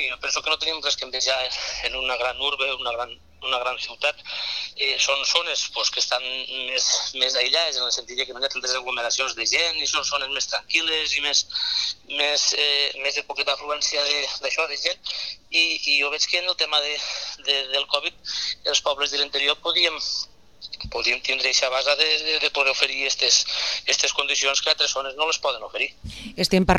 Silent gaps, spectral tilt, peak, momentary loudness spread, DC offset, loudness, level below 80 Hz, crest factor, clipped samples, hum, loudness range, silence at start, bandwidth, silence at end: none; -1 dB/octave; 0 dBFS; 8 LU; 0.2%; -22 LUFS; -50 dBFS; 24 dB; under 0.1%; none; 4 LU; 0 s; 15 kHz; 0 s